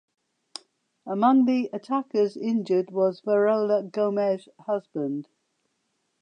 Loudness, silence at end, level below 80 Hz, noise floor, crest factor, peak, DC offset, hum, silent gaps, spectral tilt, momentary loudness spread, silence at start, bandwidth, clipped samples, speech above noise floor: -25 LUFS; 1 s; -84 dBFS; -75 dBFS; 18 dB; -8 dBFS; under 0.1%; none; none; -7.5 dB/octave; 16 LU; 1.05 s; 9.8 kHz; under 0.1%; 51 dB